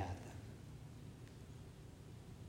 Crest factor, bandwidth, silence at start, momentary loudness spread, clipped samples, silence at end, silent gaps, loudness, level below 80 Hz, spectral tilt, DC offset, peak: 20 dB; 16 kHz; 0 s; 6 LU; under 0.1%; 0 s; none; -54 LUFS; -64 dBFS; -6 dB/octave; under 0.1%; -30 dBFS